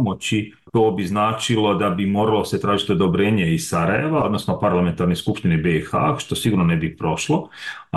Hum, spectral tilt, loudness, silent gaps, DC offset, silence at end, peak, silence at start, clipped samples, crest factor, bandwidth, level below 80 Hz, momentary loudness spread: none; -6 dB/octave; -20 LUFS; none; under 0.1%; 0 s; -8 dBFS; 0 s; under 0.1%; 12 dB; 12.5 kHz; -46 dBFS; 5 LU